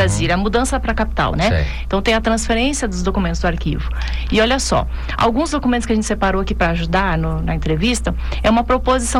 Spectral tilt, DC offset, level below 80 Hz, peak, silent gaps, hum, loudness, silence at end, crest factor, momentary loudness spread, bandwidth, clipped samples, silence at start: -5 dB/octave; under 0.1%; -24 dBFS; -4 dBFS; none; none; -18 LUFS; 0 s; 12 dB; 5 LU; 12.5 kHz; under 0.1%; 0 s